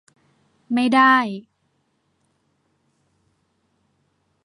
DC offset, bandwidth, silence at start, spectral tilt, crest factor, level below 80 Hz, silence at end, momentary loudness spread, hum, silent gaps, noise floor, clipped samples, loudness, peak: under 0.1%; 11.5 kHz; 0.7 s; -4.5 dB/octave; 22 dB; -76 dBFS; 3.05 s; 16 LU; none; none; -69 dBFS; under 0.1%; -17 LUFS; -4 dBFS